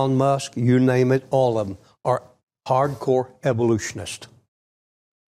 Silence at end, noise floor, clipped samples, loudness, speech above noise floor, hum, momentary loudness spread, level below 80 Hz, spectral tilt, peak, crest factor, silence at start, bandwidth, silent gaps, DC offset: 1 s; under -90 dBFS; under 0.1%; -21 LUFS; over 69 dB; none; 14 LU; -58 dBFS; -6.5 dB/octave; -8 dBFS; 14 dB; 0 s; 13 kHz; 2.43-2.47 s; under 0.1%